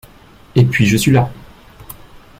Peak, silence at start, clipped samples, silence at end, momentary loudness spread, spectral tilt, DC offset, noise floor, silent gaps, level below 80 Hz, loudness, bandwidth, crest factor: -2 dBFS; 0.55 s; under 0.1%; 0.2 s; 24 LU; -6 dB/octave; under 0.1%; -43 dBFS; none; -42 dBFS; -14 LUFS; 16 kHz; 16 dB